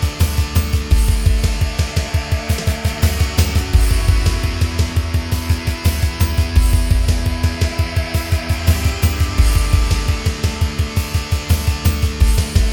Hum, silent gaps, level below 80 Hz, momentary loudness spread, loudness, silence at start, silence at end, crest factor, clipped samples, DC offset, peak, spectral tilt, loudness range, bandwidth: none; none; -18 dBFS; 4 LU; -18 LUFS; 0 s; 0 s; 14 dB; under 0.1%; under 0.1%; -2 dBFS; -5 dB/octave; 0 LU; 19 kHz